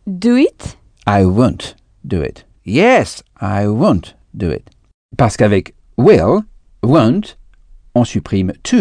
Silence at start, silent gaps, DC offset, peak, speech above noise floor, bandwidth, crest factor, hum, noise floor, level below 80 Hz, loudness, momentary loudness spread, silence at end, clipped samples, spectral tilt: 0.05 s; 4.94-5.09 s; under 0.1%; 0 dBFS; 29 dB; 10 kHz; 14 dB; none; -42 dBFS; -38 dBFS; -14 LUFS; 17 LU; 0 s; 0.2%; -7 dB/octave